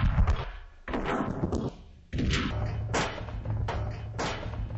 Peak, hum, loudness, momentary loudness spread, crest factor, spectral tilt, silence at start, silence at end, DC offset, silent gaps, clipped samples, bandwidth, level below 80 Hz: -14 dBFS; none; -32 LUFS; 9 LU; 16 dB; -6 dB/octave; 0 s; 0 s; under 0.1%; none; under 0.1%; 8.4 kHz; -34 dBFS